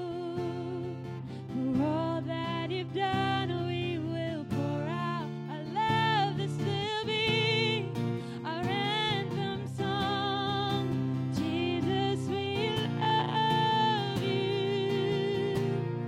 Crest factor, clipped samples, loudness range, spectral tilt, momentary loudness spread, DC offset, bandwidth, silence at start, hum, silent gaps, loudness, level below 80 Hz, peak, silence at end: 16 dB; under 0.1%; 3 LU; -6.5 dB/octave; 8 LU; under 0.1%; 14.5 kHz; 0 s; none; none; -31 LUFS; -60 dBFS; -16 dBFS; 0 s